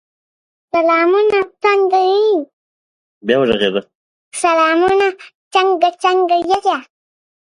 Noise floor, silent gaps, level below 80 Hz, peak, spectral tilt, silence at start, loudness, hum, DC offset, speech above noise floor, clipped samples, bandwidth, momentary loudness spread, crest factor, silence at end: under -90 dBFS; 2.53-3.21 s, 3.95-4.31 s, 5.35-5.51 s; -56 dBFS; 0 dBFS; -4 dB/octave; 0.75 s; -14 LUFS; none; under 0.1%; over 76 dB; under 0.1%; 11.5 kHz; 8 LU; 16 dB; 0.7 s